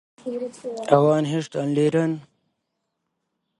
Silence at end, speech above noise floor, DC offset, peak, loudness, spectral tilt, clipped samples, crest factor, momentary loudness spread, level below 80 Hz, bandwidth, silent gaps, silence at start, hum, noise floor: 1.4 s; 56 dB; under 0.1%; 0 dBFS; -22 LUFS; -7 dB/octave; under 0.1%; 22 dB; 14 LU; -66 dBFS; 11.5 kHz; none; 0.25 s; none; -78 dBFS